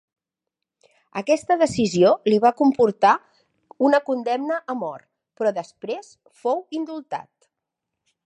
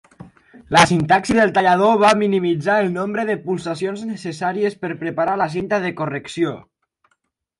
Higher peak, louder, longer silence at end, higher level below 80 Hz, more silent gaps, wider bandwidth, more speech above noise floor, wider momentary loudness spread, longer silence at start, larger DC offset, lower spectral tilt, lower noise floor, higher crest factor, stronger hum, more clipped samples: second, -4 dBFS vs 0 dBFS; second, -21 LUFS vs -18 LUFS; about the same, 1.05 s vs 1 s; second, -64 dBFS vs -54 dBFS; neither; about the same, 11 kHz vs 11.5 kHz; first, 64 dB vs 51 dB; first, 15 LU vs 11 LU; first, 1.15 s vs 0.2 s; neither; about the same, -5.5 dB/octave vs -5 dB/octave; first, -84 dBFS vs -69 dBFS; about the same, 18 dB vs 18 dB; neither; neither